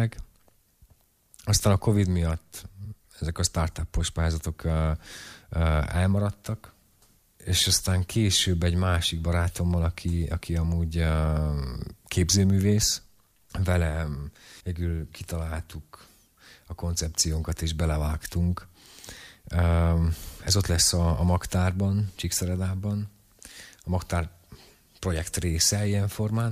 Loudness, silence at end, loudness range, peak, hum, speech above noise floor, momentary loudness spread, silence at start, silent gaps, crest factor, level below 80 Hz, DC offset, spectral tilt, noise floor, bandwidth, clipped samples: -26 LUFS; 0 s; 6 LU; -10 dBFS; none; 37 dB; 17 LU; 0 s; none; 18 dB; -36 dBFS; under 0.1%; -4.5 dB/octave; -63 dBFS; 15.5 kHz; under 0.1%